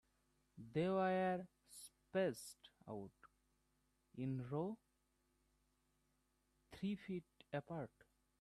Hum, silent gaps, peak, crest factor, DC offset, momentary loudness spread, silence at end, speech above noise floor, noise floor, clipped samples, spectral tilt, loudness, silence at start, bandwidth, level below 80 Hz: 50 Hz at -80 dBFS; none; -28 dBFS; 18 dB; under 0.1%; 19 LU; 0.55 s; 40 dB; -83 dBFS; under 0.1%; -6.5 dB/octave; -45 LUFS; 0.55 s; 13 kHz; -78 dBFS